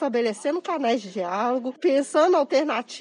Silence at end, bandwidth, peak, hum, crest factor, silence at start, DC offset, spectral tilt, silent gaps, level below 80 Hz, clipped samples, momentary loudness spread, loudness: 0 s; 10.5 kHz; -8 dBFS; none; 16 dB; 0 s; under 0.1%; -4 dB/octave; none; under -90 dBFS; under 0.1%; 7 LU; -23 LUFS